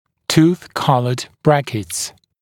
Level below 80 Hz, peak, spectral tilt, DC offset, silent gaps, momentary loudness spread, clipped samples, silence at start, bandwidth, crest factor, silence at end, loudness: -52 dBFS; 0 dBFS; -5.5 dB/octave; under 0.1%; none; 9 LU; under 0.1%; 0.3 s; 17.5 kHz; 18 dB; 0.3 s; -18 LUFS